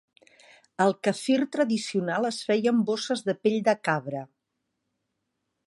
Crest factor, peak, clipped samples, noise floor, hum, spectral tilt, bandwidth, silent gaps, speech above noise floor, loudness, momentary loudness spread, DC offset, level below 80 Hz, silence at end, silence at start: 18 dB; -8 dBFS; under 0.1%; -81 dBFS; none; -5 dB/octave; 11.5 kHz; none; 55 dB; -26 LUFS; 5 LU; under 0.1%; -78 dBFS; 1.4 s; 0.8 s